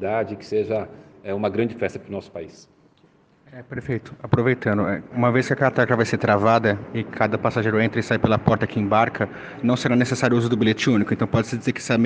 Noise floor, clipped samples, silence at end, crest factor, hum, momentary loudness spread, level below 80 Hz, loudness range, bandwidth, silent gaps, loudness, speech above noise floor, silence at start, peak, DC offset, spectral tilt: -57 dBFS; under 0.1%; 0 s; 20 dB; none; 11 LU; -54 dBFS; 8 LU; 9.6 kHz; none; -21 LUFS; 36 dB; 0 s; -2 dBFS; under 0.1%; -6.5 dB/octave